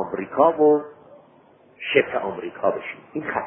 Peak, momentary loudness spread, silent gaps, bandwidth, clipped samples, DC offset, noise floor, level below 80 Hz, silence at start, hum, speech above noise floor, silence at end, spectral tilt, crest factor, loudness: -4 dBFS; 15 LU; none; 3.4 kHz; under 0.1%; under 0.1%; -54 dBFS; -62 dBFS; 0 s; none; 32 dB; 0 s; -10 dB/octave; 20 dB; -22 LUFS